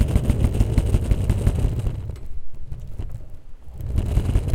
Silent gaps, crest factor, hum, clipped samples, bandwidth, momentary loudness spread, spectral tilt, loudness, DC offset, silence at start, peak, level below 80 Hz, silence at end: none; 18 dB; none; under 0.1%; 15.5 kHz; 18 LU; -7.5 dB/octave; -23 LUFS; under 0.1%; 0 s; -2 dBFS; -24 dBFS; 0 s